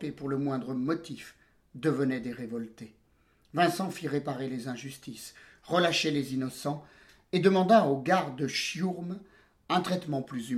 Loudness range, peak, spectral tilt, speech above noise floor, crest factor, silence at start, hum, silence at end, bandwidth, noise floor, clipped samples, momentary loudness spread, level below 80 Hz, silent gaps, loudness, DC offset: 7 LU; -8 dBFS; -5.5 dB/octave; 37 dB; 22 dB; 0 s; none; 0 s; 15.5 kHz; -67 dBFS; under 0.1%; 18 LU; -68 dBFS; none; -30 LUFS; under 0.1%